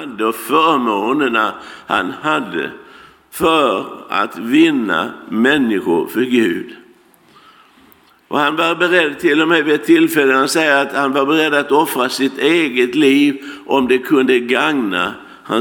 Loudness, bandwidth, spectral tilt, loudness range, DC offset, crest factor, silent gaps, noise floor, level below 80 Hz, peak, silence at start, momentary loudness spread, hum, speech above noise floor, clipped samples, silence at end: -15 LUFS; 18 kHz; -4 dB/octave; 5 LU; under 0.1%; 16 dB; none; -49 dBFS; -58 dBFS; 0 dBFS; 0 s; 9 LU; none; 34 dB; under 0.1%; 0 s